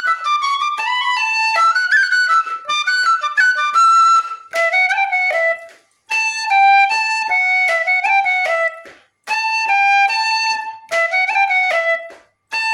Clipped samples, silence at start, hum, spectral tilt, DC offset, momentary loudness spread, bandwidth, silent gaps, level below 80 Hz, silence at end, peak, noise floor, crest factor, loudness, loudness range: under 0.1%; 0 s; none; 2.5 dB/octave; under 0.1%; 8 LU; 14 kHz; none; -78 dBFS; 0 s; -4 dBFS; -42 dBFS; 12 dB; -14 LUFS; 2 LU